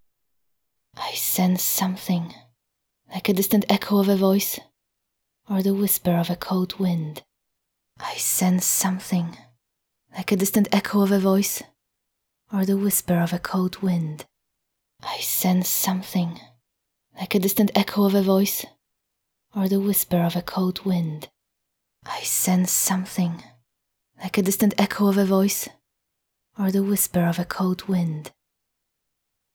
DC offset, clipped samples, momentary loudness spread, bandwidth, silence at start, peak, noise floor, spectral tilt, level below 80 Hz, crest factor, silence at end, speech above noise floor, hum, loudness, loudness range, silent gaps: under 0.1%; under 0.1%; 13 LU; over 20 kHz; 0.95 s; -4 dBFS; -79 dBFS; -5 dB/octave; -60 dBFS; 20 dB; 1.25 s; 57 dB; none; -22 LUFS; 3 LU; none